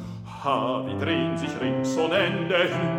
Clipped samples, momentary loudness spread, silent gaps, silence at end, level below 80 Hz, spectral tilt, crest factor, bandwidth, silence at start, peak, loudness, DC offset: under 0.1%; 5 LU; none; 0 s; -58 dBFS; -5.5 dB/octave; 16 dB; 16 kHz; 0 s; -8 dBFS; -25 LUFS; under 0.1%